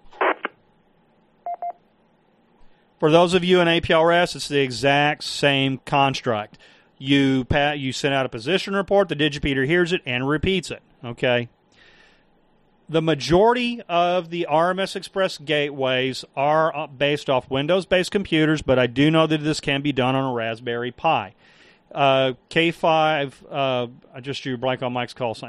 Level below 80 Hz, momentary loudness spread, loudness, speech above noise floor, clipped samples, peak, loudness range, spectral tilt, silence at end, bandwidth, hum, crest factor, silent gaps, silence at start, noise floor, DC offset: -48 dBFS; 11 LU; -21 LUFS; 39 dB; under 0.1%; -2 dBFS; 4 LU; -5.5 dB/octave; 0 s; 12.5 kHz; none; 20 dB; none; 0.05 s; -60 dBFS; under 0.1%